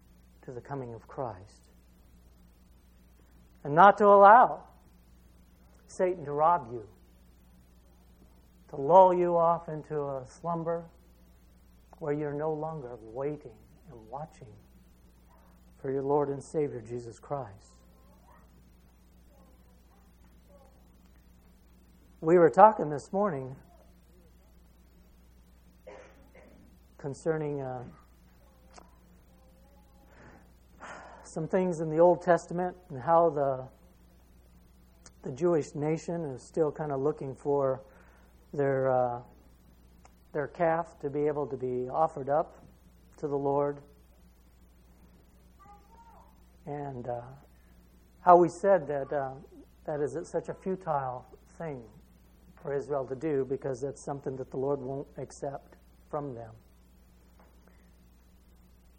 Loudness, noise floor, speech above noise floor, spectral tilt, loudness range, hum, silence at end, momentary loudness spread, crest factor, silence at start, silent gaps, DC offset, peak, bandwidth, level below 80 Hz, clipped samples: -28 LUFS; -59 dBFS; 31 dB; -7.5 dB/octave; 18 LU; none; 2.45 s; 23 LU; 28 dB; 0.5 s; none; under 0.1%; -4 dBFS; 16 kHz; -60 dBFS; under 0.1%